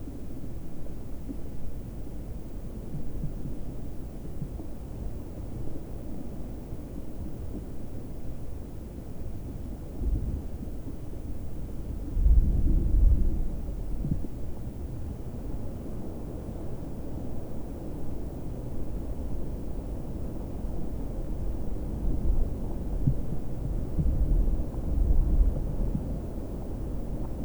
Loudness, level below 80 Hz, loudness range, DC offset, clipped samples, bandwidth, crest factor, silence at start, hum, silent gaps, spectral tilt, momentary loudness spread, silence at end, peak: -35 LUFS; -32 dBFS; 10 LU; under 0.1%; under 0.1%; over 20 kHz; 18 dB; 0 s; none; none; -9 dB/octave; 13 LU; 0 s; -10 dBFS